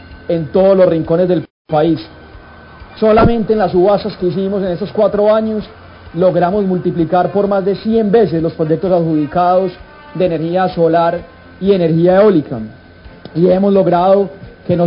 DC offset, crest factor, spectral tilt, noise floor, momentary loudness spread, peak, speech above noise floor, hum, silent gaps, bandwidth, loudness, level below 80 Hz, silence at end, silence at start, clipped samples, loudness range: under 0.1%; 12 dB; -13 dB/octave; -36 dBFS; 10 LU; -2 dBFS; 24 dB; none; 1.50-1.65 s; 5.4 kHz; -13 LUFS; -38 dBFS; 0 s; 0 s; under 0.1%; 2 LU